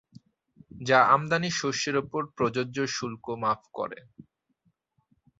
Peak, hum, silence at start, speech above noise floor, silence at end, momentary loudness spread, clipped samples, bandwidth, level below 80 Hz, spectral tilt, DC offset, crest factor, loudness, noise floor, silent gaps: -8 dBFS; none; 0.75 s; 45 dB; 1.45 s; 15 LU; under 0.1%; 8 kHz; -66 dBFS; -4 dB/octave; under 0.1%; 22 dB; -27 LUFS; -72 dBFS; none